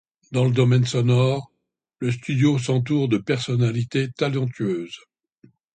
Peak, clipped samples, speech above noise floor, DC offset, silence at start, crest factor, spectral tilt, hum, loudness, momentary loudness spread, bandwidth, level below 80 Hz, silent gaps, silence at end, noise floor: -6 dBFS; under 0.1%; 53 dB; under 0.1%; 0.3 s; 16 dB; -7 dB/octave; none; -22 LUFS; 10 LU; 9.2 kHz; -58 dBFS; none; 0.75 s; -74 dBFS